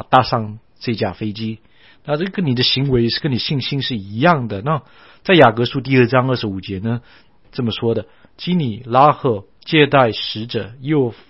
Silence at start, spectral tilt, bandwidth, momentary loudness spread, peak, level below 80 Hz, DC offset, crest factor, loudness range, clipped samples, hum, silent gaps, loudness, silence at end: 0.1 s; -9 dB/octave; 6 kHz; 13 LU; 0 dBFS; -48 dBFS; 0.3%; 18 dB; 3 LU; under 0.1%; none; none; -17 LUFS; 0.15 s